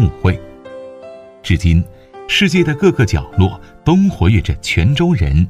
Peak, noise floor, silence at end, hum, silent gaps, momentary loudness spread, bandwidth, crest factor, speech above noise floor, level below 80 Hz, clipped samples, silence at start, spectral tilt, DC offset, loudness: 0 dBFS; -35 dBFS; 0 s; none; none; 20 LU; 13.5 kHz; 14 dB; 22 dB; -26 dBFS; under 0.1%; 0 s; -6.5 dB/octave; under 0.1%; -15 LUFS